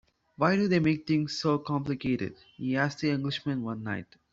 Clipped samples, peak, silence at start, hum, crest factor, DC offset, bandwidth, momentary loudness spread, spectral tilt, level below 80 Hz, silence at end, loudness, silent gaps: under 0.1%; -10 dBFS; 0.4 s; none; 20 dB; under 0.1%; 7.8 kHz; 10 LU; -6.5 dB/octave; -62 dBFS; 0.3 s; -29 LUFS; none